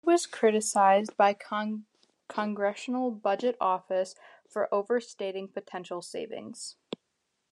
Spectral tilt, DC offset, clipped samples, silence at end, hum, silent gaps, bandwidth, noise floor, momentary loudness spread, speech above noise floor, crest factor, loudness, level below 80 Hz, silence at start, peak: -4 dB/octave; under 0.1%; under 0.1%; 0.8 s; none; none; 12.5 kHz; -79 dBFS; 16 LU; 51 dB; 20 dB; -29 LUFS; -88 dBFS; 0.05 s; -10 dBFS